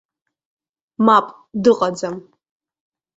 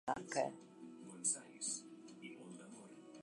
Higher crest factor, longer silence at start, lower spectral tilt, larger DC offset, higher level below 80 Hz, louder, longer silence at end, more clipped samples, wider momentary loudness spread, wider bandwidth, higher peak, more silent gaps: about the same, 20 dB vs 22 dB; first, 1 s vs 0.05 s; first, -5.5 dB/octave vs -2.5 dB/octave; neither; first, -62 dBFS vs -84 dBFS; first, -17 LUFS vs -42 LUFS; first, 0.95 s vs 0 s; neither; second, 14 LU vs 18 LU; second, 8 kHz vs 11.5 kHz; first, -2 dBFS vs -24 dBFS; neither